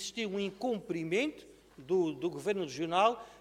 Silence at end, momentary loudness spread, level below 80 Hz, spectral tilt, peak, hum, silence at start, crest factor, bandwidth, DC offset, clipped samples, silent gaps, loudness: 0 s; 7 LU; -70 dBFS; -4.5 dB/octave; -14 dBFS; none; 0 s; 20 dB; 15 kHz; under 0.1%; under 0.1%; none; -33 LUFS